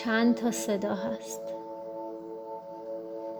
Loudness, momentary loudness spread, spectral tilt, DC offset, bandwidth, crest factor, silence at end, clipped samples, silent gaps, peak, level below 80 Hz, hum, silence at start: -32 LUFS; 15 LU; -4.5 dB/octave; under 0.1%; over 20 kHz; 18 dB; 0 s; under 0.1%; none; -14 dBFS; -72 dBFS; none; 0 s